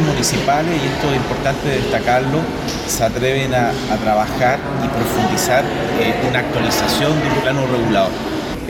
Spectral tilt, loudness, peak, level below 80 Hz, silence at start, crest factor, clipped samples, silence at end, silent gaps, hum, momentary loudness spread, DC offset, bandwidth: -4.5 dB/octave; -17 LUFS; -4 dBFS; -36 dBFS; 0 s; 14 dB; under 0.1%; 0 s; none; none; 4 LU; under 0.1%; 18 kHz